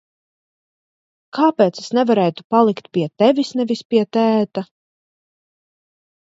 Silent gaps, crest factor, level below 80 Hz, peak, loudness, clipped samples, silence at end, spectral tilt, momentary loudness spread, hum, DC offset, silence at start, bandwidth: 2.44-2.50 s, 3.85-3.90 s; 18 dB; -68 dBFS; -2 dBFS; -17 LUFS; under 0.1%; 1.55 s; -6.5 dB/octave; 8 LU; none; under 0.1%; 1.35 s; 7.8 kHz